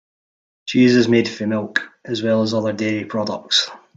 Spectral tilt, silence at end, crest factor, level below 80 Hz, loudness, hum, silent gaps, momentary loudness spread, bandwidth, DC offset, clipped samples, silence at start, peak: -4.5 dB/octave; 0.2 s; 18 dB; -60 dBFS; -19 LUFS; none; none; 10 LU; 7.8 kHz; under 0.1%; under 0.1%; 0.65 s; -2 dBFS